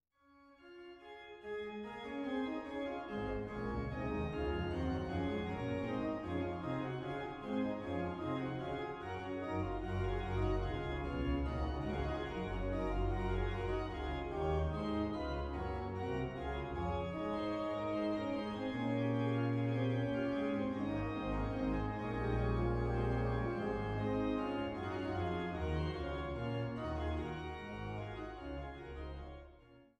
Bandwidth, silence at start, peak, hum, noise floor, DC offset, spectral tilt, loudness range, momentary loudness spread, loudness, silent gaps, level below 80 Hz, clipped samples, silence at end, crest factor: 9 kHz; 0.4 s; -24 dBFS; none; -67 dBFS; under 0.1%; -8 dB/octave; 4 LU; 8 LU; -39 LUFS; none; -46 dBFS; under 0.1%; 0.15 s; 16 dB